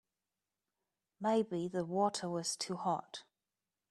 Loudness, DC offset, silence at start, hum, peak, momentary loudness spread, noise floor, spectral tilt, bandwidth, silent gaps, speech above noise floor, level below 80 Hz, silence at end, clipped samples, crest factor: -36 LUFS; under 0.1%; 1.2 s; none; -20 dBFS; 6 LU; under -90 dBFS; -4.5 dB/octave; 13 kHz; none; over 54 dB; -82 dBFS; 0.7 s; under 0.1%; 18 dB